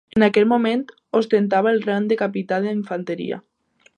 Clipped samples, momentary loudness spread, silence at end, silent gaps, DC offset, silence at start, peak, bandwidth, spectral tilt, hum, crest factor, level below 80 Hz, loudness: under 0.1%; 10 LU; 0.55 s; none; under 0.1%; 0.15 s; -2 dBFS; 9.6 kHz; -7 dB/octave; none; 18 dB; -62 dBFS; -20 LUFS